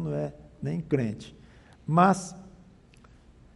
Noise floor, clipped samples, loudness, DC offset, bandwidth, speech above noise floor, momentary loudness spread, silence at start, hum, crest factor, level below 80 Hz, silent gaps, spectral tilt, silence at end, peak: -55 dBFS; under 0.1%; -27 LUFS; under 0.1%; 11.5 kHz; 29 dB; 21 LU; 0 s; none; 22 dB; -56 dBFS; none; -7 dB/octave; 1.05 s; -8 dBFS